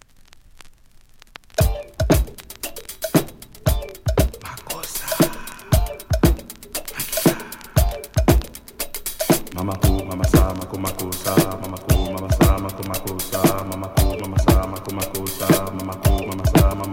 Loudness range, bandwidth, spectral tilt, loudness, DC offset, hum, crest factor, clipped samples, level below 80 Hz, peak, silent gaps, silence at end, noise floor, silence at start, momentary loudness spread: 3 LU; 17 kHz; -5.5 dB/octave; -21 LUFS; under 0.1%; none; 20 dB; under 0.1%; -26 dBFS; 0 dBFS; none; 0 s; -48 dBFS; 0.55 s; 11 LU